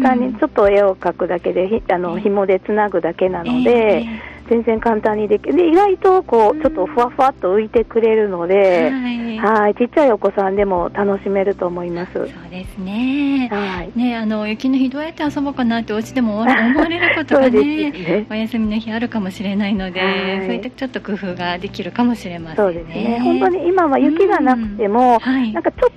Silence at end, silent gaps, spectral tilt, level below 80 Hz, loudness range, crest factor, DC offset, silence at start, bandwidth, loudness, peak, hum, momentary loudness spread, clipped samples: 0.05 s; none; -7 dB/octave; -44 dBFS; 6 LU; 14 dB; under 0.1%; 0 s; 11.5 kHz; -17 LUFS; -2 dBFS; none; 9 LU; under 0.1%